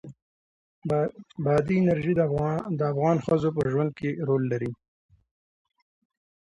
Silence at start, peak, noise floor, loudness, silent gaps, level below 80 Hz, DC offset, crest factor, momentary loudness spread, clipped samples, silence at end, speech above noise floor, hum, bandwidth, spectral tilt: 0.05 s; -10 dBFS; under -90 dBFS; -26 LUFS; 0.22-0.82 s; -58 dBFS; under 0.1%; 16 dB; 8 LU; under 0.1%; 1.75 s; over 65 dB; none; 10.5 kHz; -9 dB/octave